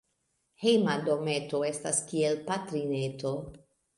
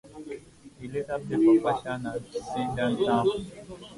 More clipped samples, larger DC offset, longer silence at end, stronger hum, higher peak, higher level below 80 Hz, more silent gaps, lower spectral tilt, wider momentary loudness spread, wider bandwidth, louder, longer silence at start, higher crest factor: neither; neither; first, 0.4 s vs 0 s; neither; about the same, -10 dBFS vs -10 dBFS; second, -66 dBFS vs -56 dBFS; neither; second, -4.5 dB/octave vs -6.5 dB/octave; second, 9 LU vs 20 LU; about the same, 11.5 kHz vs 11.5 kHz; second, -30 LUFS vs -27 LUFS; first, 0.6 s vs 0.05 s; about the same, 20 dB vs 16 dB